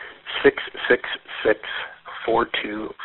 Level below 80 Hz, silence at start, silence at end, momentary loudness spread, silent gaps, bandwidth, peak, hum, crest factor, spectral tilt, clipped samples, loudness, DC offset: -54 dBFS; 0 s; 0 s; 10 LU; none; 4.2 kHz; -4 dBFS; none; 20 dB; -1 dB/octave; under 0.1%; -23 LUFS; under 0.1%